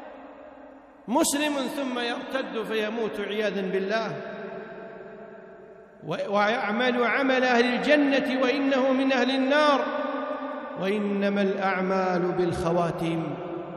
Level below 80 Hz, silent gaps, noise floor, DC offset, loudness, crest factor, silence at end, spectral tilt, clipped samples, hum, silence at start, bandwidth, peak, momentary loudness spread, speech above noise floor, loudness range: -60 dBFS; none; -48 dBFS; under 0.1%; -25 LUFS; 18 dB; 0 s; -4.5 dB/octave; under 0.1%; none; 0 s; 13.5 kHz; -6 dBFS; 19 LU; 23 dB; 8 LU